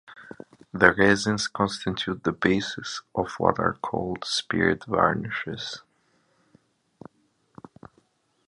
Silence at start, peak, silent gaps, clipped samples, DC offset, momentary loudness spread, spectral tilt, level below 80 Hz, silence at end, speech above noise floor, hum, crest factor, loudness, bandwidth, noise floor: 0.1 s; -2 dBFS; none; under 0.1%; under 0.1%; 16 LU; -4.5 dB/octave; -54 dBFS; 2.7 s; 42 dB; none; 26 dB; -25 LUFS; 11 kHz; -67 dBFS